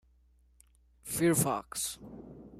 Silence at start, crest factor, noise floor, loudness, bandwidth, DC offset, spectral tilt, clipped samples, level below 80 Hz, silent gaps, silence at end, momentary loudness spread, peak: 1.05 s; 20 dB; -65 dBFS; -31 LUFS; 15.5 kHz; under 0.1%; -4.5 dB/octave; under 0.1%; -62 dBFS; none; 0 s; 22 LU; -16 dBFS